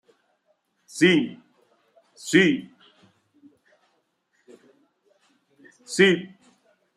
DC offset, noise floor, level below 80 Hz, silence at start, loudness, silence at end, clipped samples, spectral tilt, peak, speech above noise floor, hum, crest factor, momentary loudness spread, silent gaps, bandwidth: under 0.1%; -71 dBFS; -70 dBFS; 0.95 s; -21 LUFS; 0.7 s; under 0.1%; -4.5 dB/octave; -4 dBFS; 50 dB; none; 22 dB; 20 LU; none; 13.5 kHz